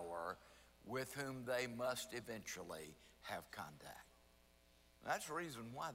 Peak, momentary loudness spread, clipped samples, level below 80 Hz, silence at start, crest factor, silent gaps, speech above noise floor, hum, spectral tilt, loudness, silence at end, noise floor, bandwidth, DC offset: -28 dBFS; 15 LU; under 0.1%; -74 dBFS; 0 s; 20 dB; none; 24 dB; none; -3.5 dB/octave; -47 LUFS; 0 s; -71 dBFS; 16 kHz; under 0.1%